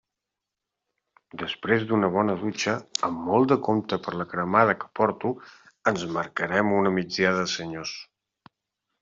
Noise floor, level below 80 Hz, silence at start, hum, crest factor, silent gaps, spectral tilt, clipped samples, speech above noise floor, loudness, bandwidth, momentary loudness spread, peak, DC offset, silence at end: -86 dBFS; -64 dBFS; 1.35 s; none; 22 dB; none; -4 dB/octave; under 0.1%; 61 dB; -25 LUFS; 7.6 kHz; 12 LU; -4 dBFS; under 0.1%; 1 s